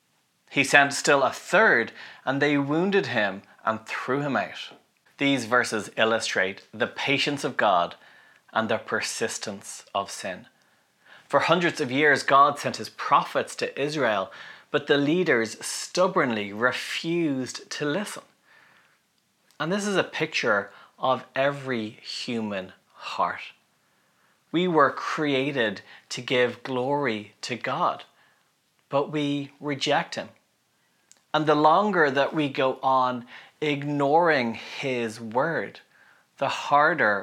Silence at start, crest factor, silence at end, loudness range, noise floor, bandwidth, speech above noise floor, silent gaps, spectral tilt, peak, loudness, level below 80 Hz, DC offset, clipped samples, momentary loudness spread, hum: 0.5 s; 24 dB; 0 s; 7 LU; -69 dBFS; 15.5 kHz; 44 dB; none; -4 dB/octave; -2 dBFS; -25 LUFS; -82 dBFS; under 0.1%; under 0.1%; 13 LU; none